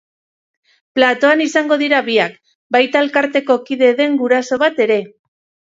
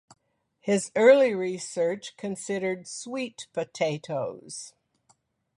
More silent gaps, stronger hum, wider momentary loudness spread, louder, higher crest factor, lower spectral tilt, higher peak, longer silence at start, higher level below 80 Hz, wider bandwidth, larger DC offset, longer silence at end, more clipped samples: first, 2.55-2.70 s vs none; neither; second, 5 LU vs 18 LU; first, -15 LUFS vs -26 LUFS; second, 16 dB vs 22 dB; about the same, -3.5 dB/octave vs -4.5 dB/octave; first, 0 dBFS vs -6 dBFS; first, 0.95 s vs 0.65 s; first, -66 dBFS vs -76 dBFS; second, 7.8 kHz vs 11.5 kHz; neither; second, 0.6 s vs 0.9 s; neither